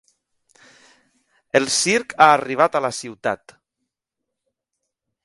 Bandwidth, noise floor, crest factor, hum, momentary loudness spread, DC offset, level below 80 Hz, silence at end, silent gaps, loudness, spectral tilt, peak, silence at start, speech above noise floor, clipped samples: 11.5 kHz; -82 dBFS; 22 dB; none; 12 LU; under 0.1%; -66 dBFS; 1.9 s; none; -18 LUFS; -2.5 dB/octave; 0 dBFS; 1.55 s; 63 dB; under 0.1%